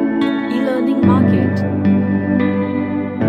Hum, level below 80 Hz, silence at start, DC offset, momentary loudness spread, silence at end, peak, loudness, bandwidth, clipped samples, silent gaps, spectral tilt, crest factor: none; -52 dBFS; 0 s; under 0.1%; 6 LU; 0 s; -2 dBFS; -16 LUFS; 5.6 kHz; under 0.1%; none; -9.5 dB/octave; 14 dB